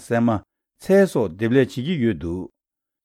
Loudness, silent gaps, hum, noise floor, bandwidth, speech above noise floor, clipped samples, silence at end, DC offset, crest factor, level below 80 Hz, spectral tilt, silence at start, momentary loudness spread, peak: -21 LUFS; none; none; -84 dBFS; 15.5 kHz; 64 dB; under 0.1%; 0.6 s; under 0.1%; 16 dB; -54 dBFS; -7 dB/octave; 0 s; 14 LU; -6 dBFS